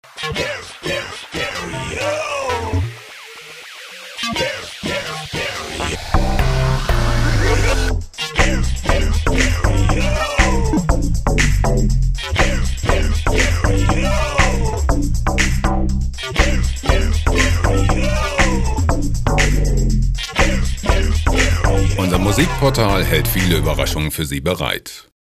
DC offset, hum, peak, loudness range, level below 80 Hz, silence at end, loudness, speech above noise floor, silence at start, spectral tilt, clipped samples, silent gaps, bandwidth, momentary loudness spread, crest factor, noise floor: under 0.1%; none; 0 dBFS; 7 LU; -20 dBFS; 0.35 s; -18 LUFS; 18 dB; 0.15 s; -4.5 dB/octave; under 0.1%; none; 15.5 kHz; 7 LU; 16 dB; -36 dBFS